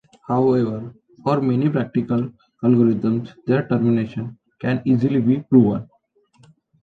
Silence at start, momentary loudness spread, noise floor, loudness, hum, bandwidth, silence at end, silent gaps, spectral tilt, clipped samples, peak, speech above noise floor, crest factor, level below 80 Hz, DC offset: 0.3 s; 12 LU; -58 dBFS; -20 LUFS; none; 4.7 kHz; 1 s; none; -10 dB/octave; under 0.1%; -2 dBFS; 40 dB; 18 dB; -56 dBFS; under 0.1%